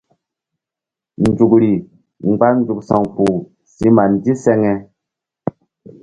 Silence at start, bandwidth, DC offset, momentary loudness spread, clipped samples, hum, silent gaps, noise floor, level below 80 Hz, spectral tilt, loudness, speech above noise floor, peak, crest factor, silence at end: 1.2 s; 11 kHz; under 0.1%; 13 LU; under 0.1%; none; none; -86 dBFS; -48 dBFS; -8.5 dB/octave; -15 LUFS; 73 dB; 0 dBFS; 16 dB; 0.55 s